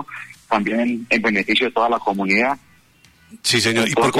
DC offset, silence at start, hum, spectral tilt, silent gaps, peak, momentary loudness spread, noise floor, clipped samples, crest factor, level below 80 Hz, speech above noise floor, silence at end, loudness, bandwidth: under 0.1%; 0 s; none; -3.5 dB/octave; none; -4 dBFS; 7 LU; -53 dBFS; under 0.1%; 16 dB; -58 dBFS; 34 dB; 0 s; -18 LUFS; 16 kHz